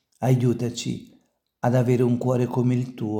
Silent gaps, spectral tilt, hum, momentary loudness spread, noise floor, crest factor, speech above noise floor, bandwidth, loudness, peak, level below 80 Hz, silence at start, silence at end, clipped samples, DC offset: none; -7.5 dB/octave; none; 9 LU; -62 dBFS; 16 dB; 40 dB; 15 kHz; -23 LUFS; -8 dBFS; -64 dBFS; 0.2 s; 0 s; under 0.1%; under 0.1%